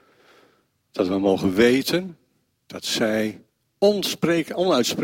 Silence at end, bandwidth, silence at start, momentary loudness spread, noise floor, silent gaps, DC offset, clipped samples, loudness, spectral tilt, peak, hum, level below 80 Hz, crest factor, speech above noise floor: 0 s; 16.5 kHz; 0.95 s; 13 LU; -63 dBFS; none; under 0.1%; under 0.1%; -22 LUFS; -4.5 dB/octave; -4 dBFS; none; -58 dBFS; 18 dB; 42 dB